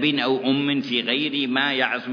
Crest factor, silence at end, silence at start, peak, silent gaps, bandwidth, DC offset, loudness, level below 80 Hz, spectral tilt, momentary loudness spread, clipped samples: 16 dB; 0 s; 0 s; -6 dBFS; none; 5.4 kHz; under 0.1%; -21 LUFS; -72 dBFS; -6 dB/octave; 2 LU; under 0.1%